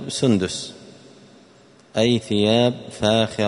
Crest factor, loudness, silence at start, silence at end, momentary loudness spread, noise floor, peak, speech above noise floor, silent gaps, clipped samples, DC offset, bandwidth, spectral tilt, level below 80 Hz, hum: 18 dB; -20 LUFS; 0 s; 0 s; 11 LU; -51 dBFS; -4 dBFS; 31 dB; none; under 0.1%; under 0.1%; 11 kHz; -5 dB/octave; -56 dBFS; none